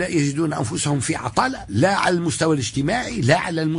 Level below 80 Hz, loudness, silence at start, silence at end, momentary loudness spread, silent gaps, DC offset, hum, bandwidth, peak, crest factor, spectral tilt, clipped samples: -46 dBFS; -21 LUFS; 0 s; 0 s; 4 LU; none; under 0.1%; none; 11 kHz; -4 dBFS; 16 dB; -5 dB/octave; under 0.1%